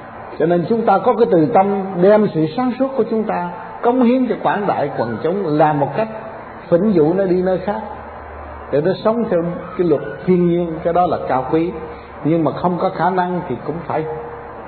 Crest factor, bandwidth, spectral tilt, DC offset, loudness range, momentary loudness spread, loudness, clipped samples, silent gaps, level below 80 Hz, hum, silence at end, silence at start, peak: 16 dB; 4.5 kHz; -12 dB/octave; under 0.1%; 3 LU; 13 LU; -17 LUFS; under 0.1%; none; -48 dBFS; none; 0 s; 0 s; -2 dBFS